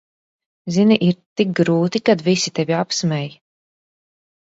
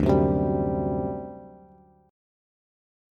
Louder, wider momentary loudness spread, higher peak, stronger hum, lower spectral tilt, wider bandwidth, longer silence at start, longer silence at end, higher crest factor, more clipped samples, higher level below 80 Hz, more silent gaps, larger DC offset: first, -18 LUFS vs -25 LUFS; second, 8 LU vs 18 LU; first, -2 dBFS vs -8 dBFS; neither; second, -5.5 dB/octave vs -10.5 dB/octave; about the same, 8 kHz vs 7.4 kHz; first, 0.65 s vs 0 s; second, 1.15 s vs 1.55 s; about the same, 18 dB vs 20 dB; neither; second, -62 dBFS vs -42 dBFS; first, 1.26-1.36 s vs none; neither